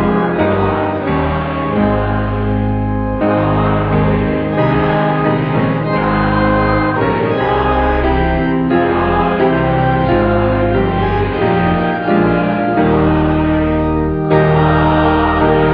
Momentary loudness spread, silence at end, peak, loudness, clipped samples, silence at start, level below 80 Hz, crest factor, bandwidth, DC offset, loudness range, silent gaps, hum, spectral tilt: 4 LU; 0 s; 0 dBFS; -14 LUFS; under 0.1%; 0 s; -26 dBFS; 14 dB; 5.2 kHz; under 0.1%; 2 LU; none; none; -10.5 dB/octave